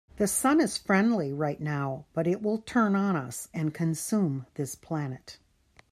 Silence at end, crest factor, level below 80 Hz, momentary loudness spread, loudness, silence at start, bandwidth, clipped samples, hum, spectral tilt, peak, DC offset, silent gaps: 0.55 s; 18 dB; -62 dBFS; 10 LU; -28 LUFS; 0.15 s; 15 kHz; under 0.1%; none; -5.5 dB/octave; -12 dBFS; under 0.1%; none